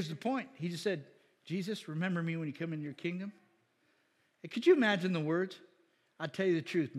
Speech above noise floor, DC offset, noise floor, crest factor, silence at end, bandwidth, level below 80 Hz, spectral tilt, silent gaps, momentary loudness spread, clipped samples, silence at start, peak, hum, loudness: 40 dB; under 0.1%; -74 dBFS; 20 dB; 0 s; 12.5 kHz; -90 dBFS; -6.5 dB/octave; none; 14 LU; under 0.1%; 0 s; -14 dBFS; none; -34 LUFS